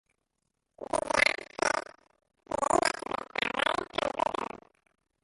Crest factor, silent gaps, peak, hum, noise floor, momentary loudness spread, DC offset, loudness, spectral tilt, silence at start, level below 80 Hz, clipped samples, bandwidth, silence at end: 26 dB; none; -8 dBFS; none; -81 dBFS; 13 LU; under 0.1%; -30 LUFS; -2 dB/octave; 0.8 s; -60 dBFS; under 0.1%; 12 kHz; 0.65 s